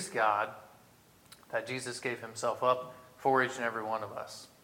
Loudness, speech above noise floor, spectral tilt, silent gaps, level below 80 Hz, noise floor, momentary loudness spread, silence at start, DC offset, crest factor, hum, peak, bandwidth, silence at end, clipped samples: -33 LUFS; 28 dB; -3.5 dB/octave; none; -78 dBFS; -61 dBFS; 13 LU; 0 s; under 0.1%; 20 dB; none; -14 dBFS; 18.5 kHz; 0.2 s; under 0.1%